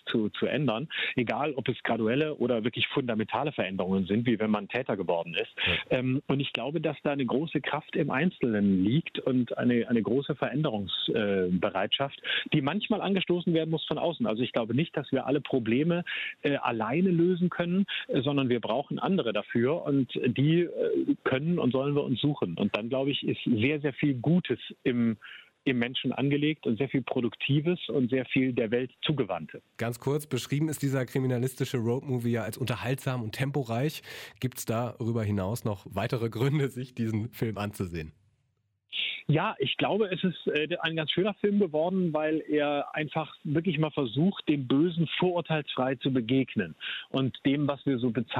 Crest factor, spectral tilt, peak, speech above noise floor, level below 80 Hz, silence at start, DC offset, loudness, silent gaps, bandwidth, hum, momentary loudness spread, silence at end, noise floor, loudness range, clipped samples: 16 dB; -6.5 dB/octave; -12 dBFS; 47 dB; -64 dBFS; 0.05 s; under 0.1%; -29 LUFS; none; 16 kHz; none; 5 LU; 0 s; -75 dBFS; 3 LU; under 0.1%